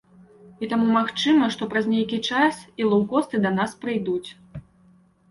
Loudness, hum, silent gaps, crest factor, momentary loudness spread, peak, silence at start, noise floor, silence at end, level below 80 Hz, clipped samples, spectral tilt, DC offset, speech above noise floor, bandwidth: -22 LUFS; none; none; 16 dB; 14 LU; -8 dBFS; 0.6 s; -57 dBFS; 0.7 s; -60 dBFS; under 0.1%; -5.5 dB/octave; under 0.1%; 34 dB; 11.5 kHz